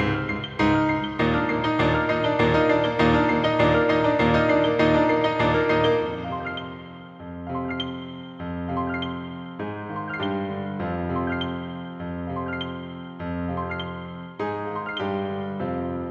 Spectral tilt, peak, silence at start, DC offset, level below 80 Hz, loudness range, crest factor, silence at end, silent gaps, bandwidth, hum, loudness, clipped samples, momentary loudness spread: -7.5 dB/octave; -6 dBFS; 0 s; under 0.1%; -44 dBFS; 11 LU; 18 dB; 0 s; none; 7.8 kHz; none; -24 LUFS; under 0.1%; 14 LU